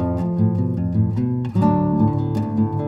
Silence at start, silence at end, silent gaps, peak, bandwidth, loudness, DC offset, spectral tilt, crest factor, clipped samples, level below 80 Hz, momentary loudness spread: 0 s; 0 s; none; -4 dBFS; 5.6 kHz; -20 LUFS; under 0.1%; -11 dB/octave; 14 dB; under 0.1%; -42 dBFS; 4 LU